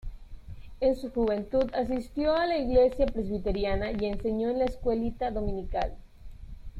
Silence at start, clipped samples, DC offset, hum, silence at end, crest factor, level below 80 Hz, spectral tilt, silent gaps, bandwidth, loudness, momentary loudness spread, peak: 0.05 s; under 0.1%; under 0.1%; none; 0 s; 18 dB; -40 dBFS; -7.5 dB/octave; none; 11.5 kHz; -29 LUFS; 13 LU; -12 dBFS